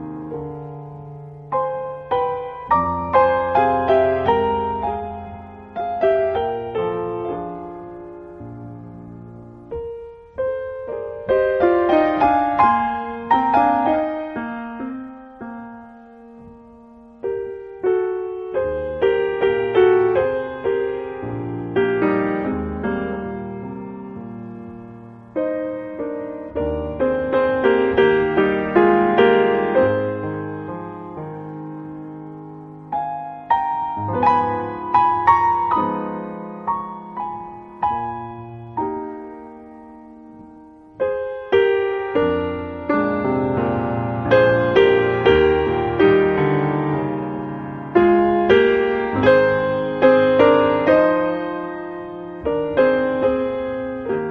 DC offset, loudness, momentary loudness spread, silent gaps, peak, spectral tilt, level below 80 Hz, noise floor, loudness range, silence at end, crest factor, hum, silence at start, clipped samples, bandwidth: under 0.1%; -19 LUFS; 19 LU; none; -2 dBFS; -8.5 dB/octave; -46 dBFS; -44 dBFS; 12 LU; 0 s; 18 dB; none; 0 s; under 0.1%; 6.2 kHz